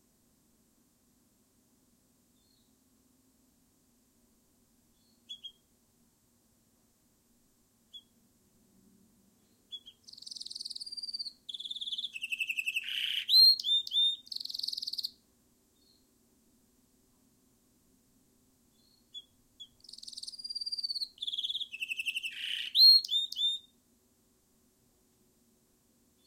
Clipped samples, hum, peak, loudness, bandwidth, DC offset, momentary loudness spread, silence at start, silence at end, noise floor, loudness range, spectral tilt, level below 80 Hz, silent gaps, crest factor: under 0.1%; none; -12 dBFS; -28 LUFS; 16.5 kHz; under 0.1%; 29 LU; 5.3 s; 2.65 s; -70 dBFS; 19 LU; 2.5 dB/octave; -80 dBFS; none; 24 dB